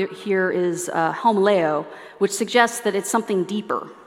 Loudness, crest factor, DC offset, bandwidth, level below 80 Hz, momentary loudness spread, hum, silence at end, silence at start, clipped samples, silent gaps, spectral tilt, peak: -21 LUFS; 20 dB; under 0.1%; 16.5 kHz; -74 dBFS; 7 LU; none; 0.05 s; 0 s; under 0.1%; none; -4 dB/octave; -2 dBFS